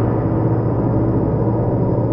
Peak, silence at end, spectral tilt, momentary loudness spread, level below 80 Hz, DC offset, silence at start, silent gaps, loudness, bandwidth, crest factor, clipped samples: -4 dBFS; 0 s; -13.5 dB/octave; 1 LU; -32 dBFS; under 0.1%; 0 s; none; -18 LUFS; 2.8 kHz; 12 dB; under 0.1%